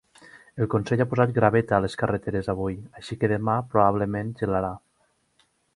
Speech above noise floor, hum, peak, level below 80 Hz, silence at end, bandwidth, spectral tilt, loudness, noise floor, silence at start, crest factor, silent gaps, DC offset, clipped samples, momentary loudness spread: 44 dB; none; -4 dBFS; -50 dBFS; 0.95 s; 11.5 kHz; -8 dB/octave; -24 LUFS; -68 dBFS; 0.35 s; 22 dB; none; under 0.1%; under 0.1%; 11 LU